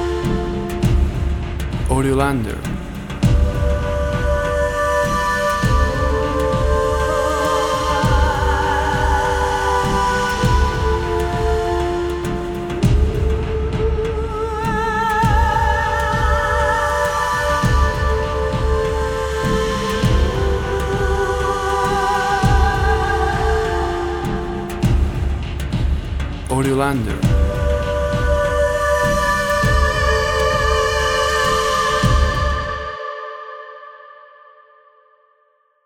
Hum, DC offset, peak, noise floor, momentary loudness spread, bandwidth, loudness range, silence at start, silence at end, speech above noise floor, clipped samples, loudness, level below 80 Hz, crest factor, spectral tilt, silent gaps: none; under 0.1%; -4 dBFS; -60 dBFS; 7 LU; 17 kHz; 4 LU; 0 s; 1.7 s; 42 dB; under 0.1%; -18 LUFS; -22 dBFS; 14 dB; -5.5 dB/octave; none